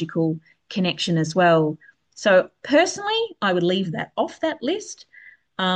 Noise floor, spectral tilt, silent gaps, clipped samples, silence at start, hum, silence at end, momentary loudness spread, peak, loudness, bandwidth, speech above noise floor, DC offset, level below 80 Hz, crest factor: -49 dBFS; -5 dB/octave; none; under 0.1%; 0 s; none; 0 s; 13 LU; -6 dBFS; -22 LUFS; 9.2 kHz; 28 dB; under 0.1%; -68 dBFS; 16 dB